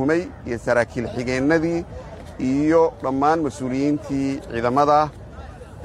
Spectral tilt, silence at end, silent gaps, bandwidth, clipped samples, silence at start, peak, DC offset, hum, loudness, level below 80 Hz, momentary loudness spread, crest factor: -6.5 dB/octave; 0 s; none; 11.5 kHz; under 0.1%; 0 s; -4 dBFS; under 0.1%; none; -21 LUFS; -44 dBFS; 19 LU; 18 dB